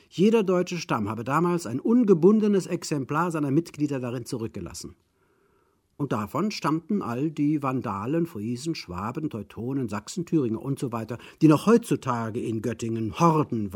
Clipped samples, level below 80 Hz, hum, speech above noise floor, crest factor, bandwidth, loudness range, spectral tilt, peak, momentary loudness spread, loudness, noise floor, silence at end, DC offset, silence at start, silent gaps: under 0.1%; -62 dBFS; none; 42 dB; 20 dB; 17 kHz; 7 LU; -7 dB/octave; -4 dBFS; 12 LU; -25 LUFS; -67 dBFS; 0 s; under 0.1%; 0.15 s; none